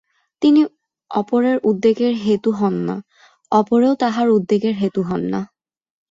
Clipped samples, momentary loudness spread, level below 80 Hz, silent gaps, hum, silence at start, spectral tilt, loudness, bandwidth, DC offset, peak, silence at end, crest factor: under 0.1%; 9 LU; -60 dBFS; none; none; 0.4 s; -7.5 dB/octave; -18 LUFS; 7.8 kHz; under 0.1%; -2 dBFS; 0.65 s; 16 dB